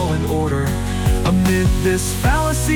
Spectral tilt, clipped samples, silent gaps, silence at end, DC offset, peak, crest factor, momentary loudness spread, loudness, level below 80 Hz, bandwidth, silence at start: -5.5 dB/octave; under 0.1%; none; 0 s; under 0.1%; -6 dBFS; 10 dB; 4 LU; -18 LUFS; -24 dBFS; 19.5 kHz; 0 s